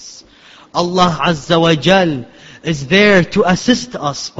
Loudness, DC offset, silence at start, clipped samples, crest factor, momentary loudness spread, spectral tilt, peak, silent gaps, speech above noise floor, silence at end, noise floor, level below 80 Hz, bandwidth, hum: -13 LUFS; under 0.1%; 0 s; under 0.1%; 14 dB; 12 LU; -5 dB/octave; 0 dBFS; none; 30 dB; 0.1 s; -43 dBFS; -44 dBFS; 8 kHz; none